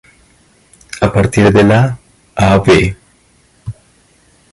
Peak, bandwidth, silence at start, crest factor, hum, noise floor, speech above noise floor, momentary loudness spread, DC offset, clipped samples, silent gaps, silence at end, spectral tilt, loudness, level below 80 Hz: 0 dBFS; 11.5 kHz; 0.95 s; 14 dB; none; -51 dBFS; 42 dB; 22 LU; under 0.1%; under 0.1%; none; 0.8 s; -6.5 dB/octave; -11 LUFS; -32 dBFS